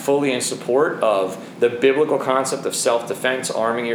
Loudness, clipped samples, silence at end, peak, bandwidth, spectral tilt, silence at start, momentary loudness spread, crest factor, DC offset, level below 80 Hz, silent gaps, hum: -20 LUFS; under 0.1%; 0 s; -4 dBFS; over 20 kHz; -3.5 dB/octave; 0 s; 5 LU; 16 dB; under 0.1%; -74 dBFS; none; none